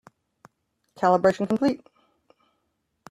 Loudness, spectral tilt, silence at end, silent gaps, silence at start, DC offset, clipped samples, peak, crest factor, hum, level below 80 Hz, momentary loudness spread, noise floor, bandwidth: -23 LUFS; -7 dB/octave; 1.35 s; none; 1 s; under 0.1%; under 0.1%; -6 dBFS; 20 dB; none; -66 dBFS; 6 LU; -75 dBFS; 12 kHz